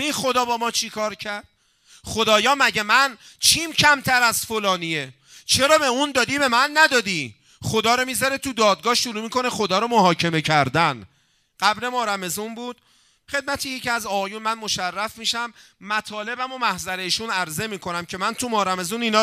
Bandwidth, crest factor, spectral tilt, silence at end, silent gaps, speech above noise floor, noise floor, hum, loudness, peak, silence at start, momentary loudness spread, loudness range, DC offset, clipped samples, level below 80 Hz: 16 kHz; 22 dB; -2.5 dB/octave; 0 s; none; 34 dB; -55 dBFS; none; -20 LUFS; 0 dBFS; 0 s; 12 LU; 7 LU; under 0.1%; under 0.1%; -56 dBFS